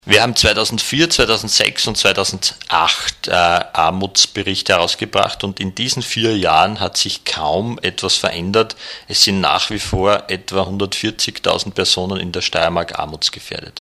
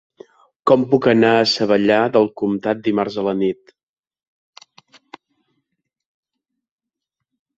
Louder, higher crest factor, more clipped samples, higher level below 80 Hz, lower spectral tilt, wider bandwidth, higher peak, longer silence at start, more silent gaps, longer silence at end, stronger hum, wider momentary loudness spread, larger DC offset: about the same, -15 LUFS vs -17 LUFS; about the same, 16 dB vs 18 dB; neither; first, -40 dBFS vs -60 dBFS; second, -2.5 dB/octave vs -6 dB/octave; first, 16 kHz vs 8 kHz; about the same, 0 dBFS vs -2 dBFS; second, 0.05 s vs 0.65 s; neither; second, 0 s vs 4.05 s; neither; about the same, 7 LU vs 8 LU; neither